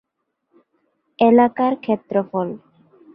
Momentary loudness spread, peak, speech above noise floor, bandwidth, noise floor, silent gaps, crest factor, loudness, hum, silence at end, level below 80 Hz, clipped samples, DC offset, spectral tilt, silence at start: 13 LU; -2 dBFS; 55 dB; 5 kHz; -73 dBFS; none; 18 dB; -18 LUFS; none; 0.6 s; -66 dBFS; under 0.1%; under 0.1%; -10.5 dB/octave; 1.2 s